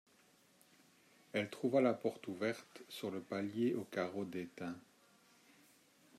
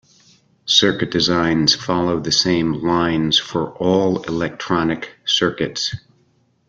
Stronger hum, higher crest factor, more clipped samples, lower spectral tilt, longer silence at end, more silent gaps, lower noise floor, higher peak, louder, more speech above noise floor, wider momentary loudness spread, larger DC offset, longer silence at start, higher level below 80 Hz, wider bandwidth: neither; about the same, 22 dB vs 18 dB; neither; first, -6 dB/octave vs -4 dB/octave; first, 1.4 s vs 0.7 s; neither; first, -70 dBFS vs -60 dBFS; second, -20 dBFS vs 0 dBFS; second, -40 LUFS vs -18 LUFS; second, 31 dB vs 42 dB; first, 14 LU vs 9 LU; neither; first, 1.35 s vs 0.65 s; second, -88 dBFS vs -50 dBFS; first, 15 kHz vs 8.6 kHz